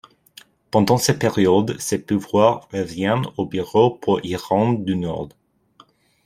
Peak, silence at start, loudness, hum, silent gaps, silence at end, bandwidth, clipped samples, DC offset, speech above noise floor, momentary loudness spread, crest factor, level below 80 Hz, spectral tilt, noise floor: -2 dBFS; 0.75 s; -20 LUFS; none; none; 0.95 s; 16 kHz; under 0.1%; under 0.1%; 35 dB; 9 LU; 18 dB; -54 dBFS; -5.5 dB/octave; -54 dBFS